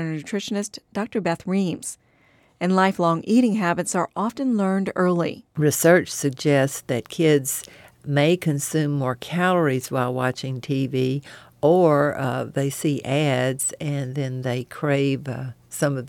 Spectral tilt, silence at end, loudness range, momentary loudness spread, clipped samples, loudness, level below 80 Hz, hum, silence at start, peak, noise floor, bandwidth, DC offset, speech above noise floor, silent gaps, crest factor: -5.5 dB/octave; 0 s; 3 LU; 9 LU; under 0.1%; -22 LUFS; -64 dBFS; none; 0 s; -4 dBFS; -58 dBFS; 17.5 kHz; under 0.1%; 37 dB; none; 18 dB